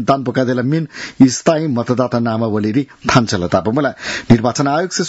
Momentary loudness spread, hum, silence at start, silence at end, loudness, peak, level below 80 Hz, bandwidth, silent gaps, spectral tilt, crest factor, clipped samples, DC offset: 6 LU; none; 0 s; 0 s; -15 LUFS; 0 dBFS; -44 dBFS; 8 kHz; none; -5.5 dB/octave; 16 dB; 0.2%; under 0.1%